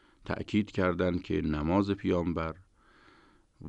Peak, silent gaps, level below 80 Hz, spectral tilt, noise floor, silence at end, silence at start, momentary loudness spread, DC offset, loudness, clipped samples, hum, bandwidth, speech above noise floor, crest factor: -14 dBFS; none; -48 dBFS; -8 dB/octave; -62 dBFS; 0 s; 0.25 s; 10 LU; under 0.1%; -31 LUFS; under 0.1%; none; 8.6 kHz; 32 dB; 18 dB